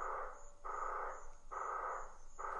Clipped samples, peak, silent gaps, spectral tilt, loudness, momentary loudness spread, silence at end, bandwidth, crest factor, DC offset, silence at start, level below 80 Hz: under 0.1%; -32 dBFS; none; -3.5 dB/octave; -46 LUFS; 10 LU; 0 s; 10.5 kHz; 14 dB; under 0.1%; 0 s; -54 dBFS